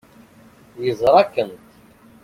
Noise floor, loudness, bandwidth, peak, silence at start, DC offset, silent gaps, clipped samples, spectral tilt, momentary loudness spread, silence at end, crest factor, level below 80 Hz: -49 dBFS; -18 LUFS; 16 kHz; -2 dBFS; 0.75 s; under 0.1%; none; under 0.1%; -6 dB/octave; 12 LU; 0.7 s; 20 dB; -56 dBFS